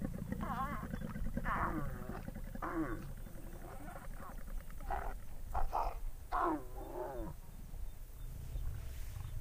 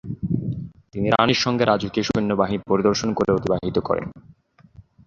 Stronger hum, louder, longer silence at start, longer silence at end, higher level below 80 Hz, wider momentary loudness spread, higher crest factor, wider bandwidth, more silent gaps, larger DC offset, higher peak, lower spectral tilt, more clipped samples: neither; second, -44 LUFS vs -21 LUFS; about the same, 0 s vs 0.05 s; second, 0 s vs 0.25 s; about the same, -44 dBFS vs -48 dBFS; first, 14 LU vs 8 LU; about the same, 20 dB vs 20 dB; first, 15.5 kHz vs 7.4 kHz; neither; neither; second, -22 dBFS vs -2 dBFS; about the same, -6.5 dB/octave vs -5.5 dB/octave; neither